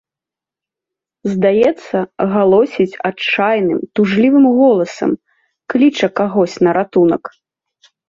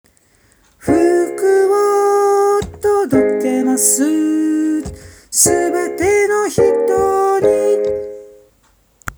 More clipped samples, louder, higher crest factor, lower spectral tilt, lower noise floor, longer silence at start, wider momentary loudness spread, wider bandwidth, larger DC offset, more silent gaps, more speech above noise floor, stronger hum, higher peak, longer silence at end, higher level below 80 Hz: neither; about the same, -14 LUFS vs -14 LUFS; about the same, 14 dB vs 14 dB; first, -6.5 dB/octave vs -4 dB/octave; first, -87 dBFS vs -55 dBFS; first, 1.25 s vs 0.85 s; first, 10 LU vs 7 LU; second, 7.6 kHz vs over 20 kHz; neither; neither; first, 74 dB vs 41 dB; neither; about the same, -2 dBFS vs 0 dBFS; first, 0.8 s vs 0.05 s; second, -58 dBFS vs -44 dBFS